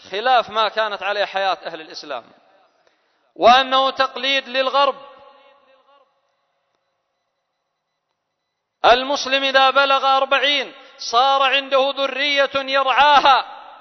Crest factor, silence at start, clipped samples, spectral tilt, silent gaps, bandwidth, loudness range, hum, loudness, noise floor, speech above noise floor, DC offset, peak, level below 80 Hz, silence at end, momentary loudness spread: 20 dB; 0.05 s; under 0.1%; -1.5 dB/octave; none; 6.4 kHz; 7 LU; none; -16 LUFS; -76 dBFS; 59 dB; under 0.1%; 0 dBFS; -58 dBFS; 0.05 s; 17 LU